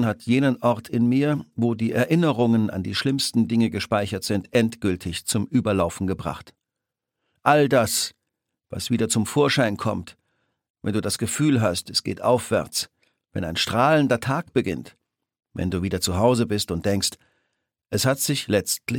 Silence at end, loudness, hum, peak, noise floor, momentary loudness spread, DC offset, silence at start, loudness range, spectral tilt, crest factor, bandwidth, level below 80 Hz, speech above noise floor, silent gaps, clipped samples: 0 s; -23 LUFS; none; -2 dBFS; -85 dBFS; 8 LU; under 0.1%; 0 s; 3 LU; -5 dB/octave; 20 dB; 17.5 kHz; -52 dBFS; 63 dB; 10.70-10.74 s; under 0.1%